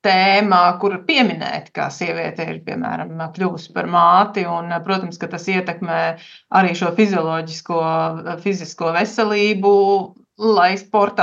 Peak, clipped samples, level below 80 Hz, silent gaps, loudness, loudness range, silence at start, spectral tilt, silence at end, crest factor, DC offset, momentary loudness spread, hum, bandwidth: 0 dBFS; under 0.1%; -72 dBFS; none; -18 LUFS; 2 LU; 0.05 s; -5.5 dB/octave; 0 s; 18 dB; under 0.1%; 12 LU; none; 7.8 kHz